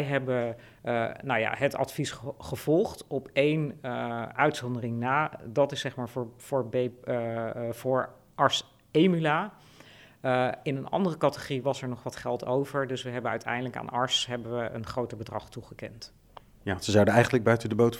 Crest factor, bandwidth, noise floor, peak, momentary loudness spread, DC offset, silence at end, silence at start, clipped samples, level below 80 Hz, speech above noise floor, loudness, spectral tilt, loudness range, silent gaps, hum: 22 dB; 17 kHz; -53 dBFS; -6 dBFS; 12 LU; under 0.1%; 0 s; 0 s; under 0.1%; -62 dBFS; 25 dB; -29 LUFS; -5.5 dB/octave; 3 LU; none; none